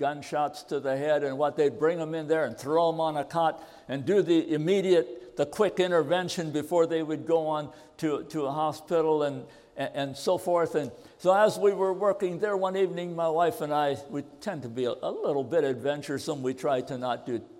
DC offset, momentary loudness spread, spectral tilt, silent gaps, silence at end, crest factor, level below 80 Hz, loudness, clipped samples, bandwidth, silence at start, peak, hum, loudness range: under 0.1%; 9 LU; -5.5 dB/octave; none; 0 s; 18 dB; -70 dBFS; -28 LUFS; under 0.1%; 16 kHz; 0 s; -10 dBFS; none; 3 LU